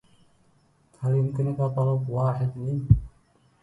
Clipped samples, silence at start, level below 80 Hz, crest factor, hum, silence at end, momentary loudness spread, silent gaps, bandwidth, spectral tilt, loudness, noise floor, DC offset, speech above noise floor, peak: under 0.1%; 1 s; -40 dBFS; 22 dB; none; 0.55 s; 6 LU; none; 3.1 kHz; -11 dB/octave; -25 LUFS; -63 dBFS; under 0.1%; 39 dB; -4 dBFS